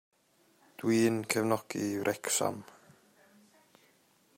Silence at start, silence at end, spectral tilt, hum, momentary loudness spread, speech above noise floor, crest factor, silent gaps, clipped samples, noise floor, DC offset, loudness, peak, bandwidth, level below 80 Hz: 0.8 s; 1.75 s; -4 dB/octave; none; 8 LU; 37 dB; 24 dB; none; under 0.1%; -68 dBFS; under 0.1%; -31 LUFS; -10 dBFS; 16 kHz; -76 dBFS